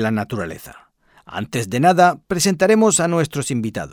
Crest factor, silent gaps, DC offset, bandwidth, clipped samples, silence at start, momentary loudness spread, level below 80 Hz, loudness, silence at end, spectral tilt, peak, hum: 18 dB; none; under 0.1%; 18.5 kHz; under 0.1%; 0 s; 16 LU; -52 dBFS; -17 LUFS; 0 s; -4.5 dB/octave; -2 dBFS; none